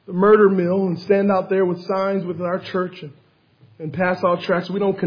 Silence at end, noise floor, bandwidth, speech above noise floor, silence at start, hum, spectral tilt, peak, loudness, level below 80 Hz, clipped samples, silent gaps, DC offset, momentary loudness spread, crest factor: 0 s; -54 dBFS; 5.2 kHz; 35 dB; 0.1 s; none; -9 dB/octave; -2 dBFS; -19 LUFS; -66 dBFS; under 0.1%; none; under 0.1%; 14 LU; 16 dB